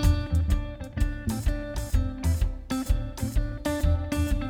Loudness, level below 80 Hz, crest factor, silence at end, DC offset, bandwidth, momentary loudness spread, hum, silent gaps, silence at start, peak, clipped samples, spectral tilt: -29 LUFS; -28 dBFS; 16 dB; 0 s; under 0.1%; 16.5 kHz; 5 LU; none; none; 0 s; -10 dBFS; under 0.1%; -6.5 dB/octave